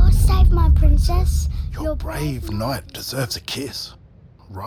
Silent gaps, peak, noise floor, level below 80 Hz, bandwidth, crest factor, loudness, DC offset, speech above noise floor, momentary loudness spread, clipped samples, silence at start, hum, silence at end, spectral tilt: none; -4 dBFS; -46 dBFS; -18 dBFS; 15.5 kHz; 12 dB; -21 LUFS; under 0.1%; 24 dB; 12 LU; under 0.1%; 0 s; none; 0 s; -5.5 dB/octave